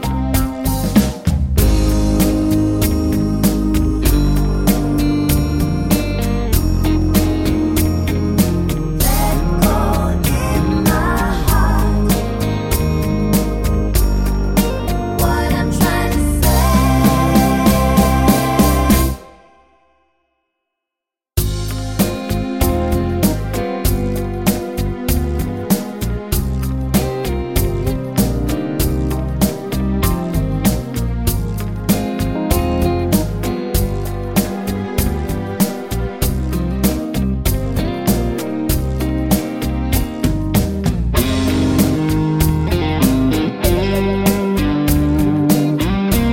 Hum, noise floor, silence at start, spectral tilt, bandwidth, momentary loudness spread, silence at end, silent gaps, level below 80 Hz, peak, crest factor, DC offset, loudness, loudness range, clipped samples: none; -85 dBFS; 0 s; -6 dB/octave; 17 kHz; 7 LU; 0 s; none; -22 dBFS; 0 dBFS; 16 dB; 0.2%; -17 LUFS; 5 LU; under 0.1%